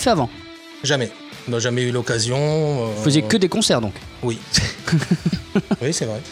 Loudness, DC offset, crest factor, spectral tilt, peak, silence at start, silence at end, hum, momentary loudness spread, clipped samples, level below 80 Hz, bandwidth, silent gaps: -20 LUFS; under 0.1%; 16 dB; -4.5 dB/octave; -4 dBFS; 0 s; 0 s; none; 10 LU; under 0.1%; -44 dBFS; 15.5 kHz; none